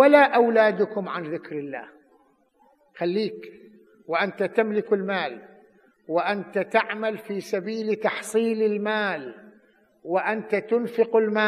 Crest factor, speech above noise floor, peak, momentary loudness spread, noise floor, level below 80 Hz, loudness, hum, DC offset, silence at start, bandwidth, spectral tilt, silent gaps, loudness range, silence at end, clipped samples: 22 dB; 38 dB; -2 dBFS; 14 LU; -62 dBFS; -82 dBFS; -24 LUFS; none; under 0.1%; 0 s; 14 kHz; -5.5 dB/octave; none; 5 LU; 0 s; under 0.1%